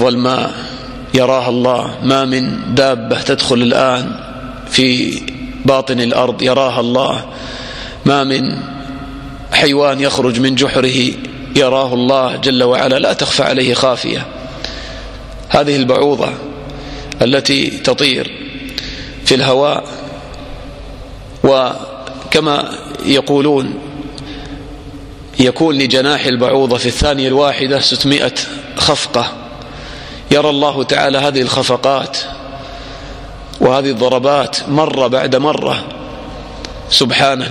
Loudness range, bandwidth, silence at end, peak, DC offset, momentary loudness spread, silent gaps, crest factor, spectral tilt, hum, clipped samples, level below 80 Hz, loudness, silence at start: 4 LU; 14 kHz; 0 s; 0 dBFS; under 0.1%; 17 LU; none; 14 dB; -4.5 dB/octave; none; under 0.1%; -36 dBFS; -13 LUFS; 0 s